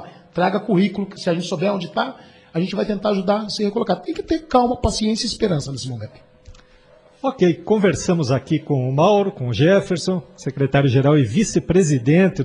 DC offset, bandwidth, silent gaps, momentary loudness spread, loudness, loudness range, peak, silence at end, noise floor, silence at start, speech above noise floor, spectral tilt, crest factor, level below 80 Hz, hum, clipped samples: under 0.1%; 10.5 kHz; none; 10 LU; -19 LUFS; 5 LU; -2 dBFS; 0 s; -50 dBFS; 0 s; 32 dB; -6 dB/octave; 16 dB; -44 dBFS; none; under 0.1%